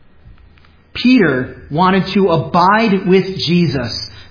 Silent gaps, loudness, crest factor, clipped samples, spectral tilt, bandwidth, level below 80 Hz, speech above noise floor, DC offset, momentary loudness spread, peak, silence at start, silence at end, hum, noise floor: none; -14 LUFS; 14 dB; under 0.1%; -7 dB/octave; 5.4 kHz; -42 dBFS; 33 dB; under 0.1%; 10 LU; 0 dBFS; 0.3 s; 0.1 s; none; -45 dBFS